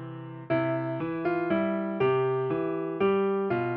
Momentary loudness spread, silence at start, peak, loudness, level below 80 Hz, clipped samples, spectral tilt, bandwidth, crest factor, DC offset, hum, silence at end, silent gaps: 5 LU; 0 s; -16 dBFS; -28 LUFS; -66 dBFS; under 0.1%; -6.5 dB/octave; 4.7 kHz; 12 dB; under 0.1%; none; 0 s; none